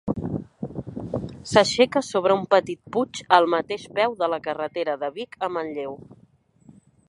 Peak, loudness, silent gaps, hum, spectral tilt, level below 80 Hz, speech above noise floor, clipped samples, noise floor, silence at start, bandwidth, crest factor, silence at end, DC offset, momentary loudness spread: -2 dBFS; -23 LUFS; none; none; -4.5 dB/octave; -54 dBFS; 35 dB; under 0.1%; -58 dBFS; 0.05 s; 11.5 kHz; 24 dB; 0.95 s; under 0.1%; 14 LU